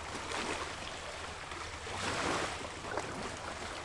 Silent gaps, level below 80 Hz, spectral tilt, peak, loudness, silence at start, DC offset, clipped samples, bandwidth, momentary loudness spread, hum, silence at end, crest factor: none; -56 dBFS; -3 dB/octave; -22 dBFS; -38 LUFS; 0 s; under 0.1%; under 0.1%; 11.5 kHz; 8 LU; none; 0 s; 18 dB